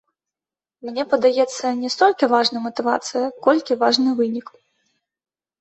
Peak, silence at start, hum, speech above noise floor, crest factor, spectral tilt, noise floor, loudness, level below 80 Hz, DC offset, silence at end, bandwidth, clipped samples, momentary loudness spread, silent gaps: -2 dBFS; 0.85 s; none; over 71 dB; 18 dB; -3 dB/octave; under -90 dBFS; -19 LUFS; -70 dBFS; under 0.1%; 1.2 s; 8.2 kHz; under 0.1%; 8 LU; none